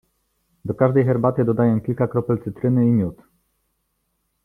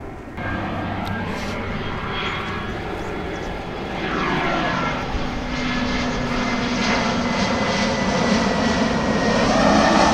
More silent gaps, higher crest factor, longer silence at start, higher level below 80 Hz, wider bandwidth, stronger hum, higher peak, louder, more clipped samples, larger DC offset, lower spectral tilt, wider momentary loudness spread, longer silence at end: neither; about the same, 18 dB vs 18 dB; first, 0.65 s vs 0 s; second, -54 dBFS vs -34 dBFS; second, 3.5 kHz vs 12.5 kHz; neither; about the same, -4 dBFS vs -2 dBFS; about the same, -20 LUFS vs -21 LUFS; neither; neither; first, -11.5 dB/octave vs -5 dB/octave; about the same, 8 LU vs 10 LU; first, 1.3 s vs 0 s